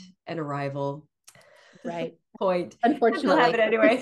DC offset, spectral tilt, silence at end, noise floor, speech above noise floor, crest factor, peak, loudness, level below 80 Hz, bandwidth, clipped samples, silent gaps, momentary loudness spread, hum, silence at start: under 0.1%; -6 dB/octave; 0 s; -55 dBFS; 31 dB; 18 dB; -6 dBFS; -24 LUFS; -72 dBFS; 12 kHz; under 0.1%; none; 16 LU; none; 0 s